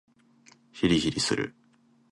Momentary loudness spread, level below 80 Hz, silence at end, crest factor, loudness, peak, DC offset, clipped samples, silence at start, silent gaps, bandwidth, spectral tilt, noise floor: 12 LU; -54 dBFS; 0.6 s; 20 dB; -27 LUFS; -10 dBFS; under 0.1%; under 0.1%; 0.75 s; none; 11.5 kHz; -4.5 dB/octave; -63 dBFS